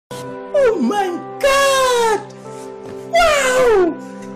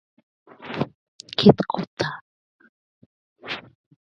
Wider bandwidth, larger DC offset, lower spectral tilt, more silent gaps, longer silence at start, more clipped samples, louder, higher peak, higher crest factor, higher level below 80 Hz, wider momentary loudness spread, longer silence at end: first, 15.5 kHz vs 7.6 kHz; neither; second, -3 dB/octave vs -7 dB/octave; second, none vs 0.95-1.19 s, 1.87-1.97 s, 2.21-2.59 s, 2.69-3.36 s; second, 0.1 s vs 0.6 s; neither; first, -15 LUFS vs -23 LUFS; second, -6 dBFS vs 0 dBFS; second, 10 dB vs 26 dB; first, -42 dBFS vs -58 dBFS; second, 19 LU vs 26 LU; second, 0 s vs 0.45 s